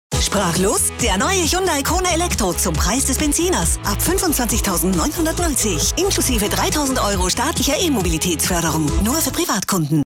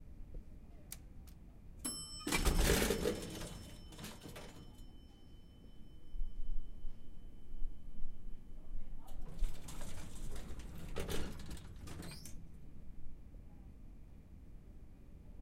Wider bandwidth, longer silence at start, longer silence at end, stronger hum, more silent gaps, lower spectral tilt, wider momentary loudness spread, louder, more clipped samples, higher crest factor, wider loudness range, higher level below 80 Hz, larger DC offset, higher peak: about the same, 17.5 kHz vs 16 kHz; about the same, 0.1 s vs 0 s; about the same, 0.05 s vs 0 s; neither; neither; about the same, -3.5 dB/octave vs -4 dB/octave; second, 2 LU vs 22 LU; first, -17 LUFS vs -43 LUFS; neither; second, 10 dB vs 20 dB; second, 1 LU vs 16 LU; first, -28 dBFS vs -44 dBFS; neither; first, -8 dBFS vs -18 dBFS